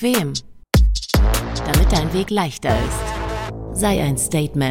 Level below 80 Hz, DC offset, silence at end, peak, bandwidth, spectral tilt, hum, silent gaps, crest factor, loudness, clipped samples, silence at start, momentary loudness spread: -22 dBFS; under 0.1%; 0 s; -4 dBFS; 17 kHz; -5 dB/octave; none; none; 14 dB; -20 LUFS; under 0.1%; 0 s; 8 LU